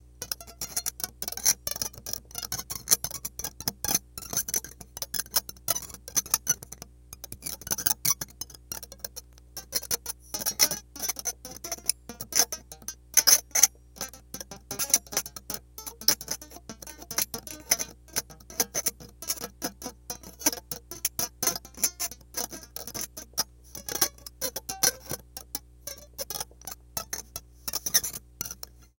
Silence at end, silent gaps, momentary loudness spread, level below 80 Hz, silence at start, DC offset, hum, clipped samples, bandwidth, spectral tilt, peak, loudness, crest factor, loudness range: 0.15 s; none; 16 LU; -54 dBFS; 0.2 s; under 0.1%; none; under 0.1%; 17.5 kHz; 0 dB/octave; -2 dBFS; -28 LUFS; 30 dB; 7 LU